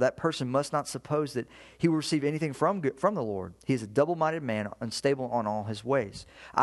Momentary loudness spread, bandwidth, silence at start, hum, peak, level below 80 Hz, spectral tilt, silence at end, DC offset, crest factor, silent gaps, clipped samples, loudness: 7 LU; 12.5 kHz; 0 s; none; -8 dBFS; -62 dBFS; -5.5 dB/octave; 0 s; under 0.1%; 20 dB; none; under 0.1%; -30 LUFS